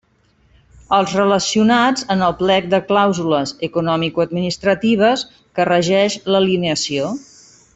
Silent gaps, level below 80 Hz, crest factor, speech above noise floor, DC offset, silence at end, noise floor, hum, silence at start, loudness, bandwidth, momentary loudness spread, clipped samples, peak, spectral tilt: none; -52 dBFS; 14 dB; 41 dB; under 0.1%; 0.55 s; -57 dBFS; none; 0.9 s; -16 LUFS; 8.4 kHz; 6 LU; under 0.1%; -2 dBFS; -4.5 dB/octave